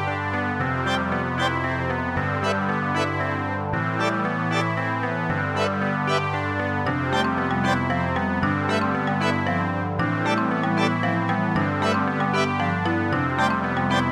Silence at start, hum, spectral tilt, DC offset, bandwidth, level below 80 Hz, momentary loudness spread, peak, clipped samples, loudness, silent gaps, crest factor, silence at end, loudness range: 0 s; none; -6 dB/octave; under 0.1%; 13 kHz; -50 dBFS; 3 LU; -8 dBFS; under 0.1%; -23 LUFS; none; 16 dB; 0 s; 2 LU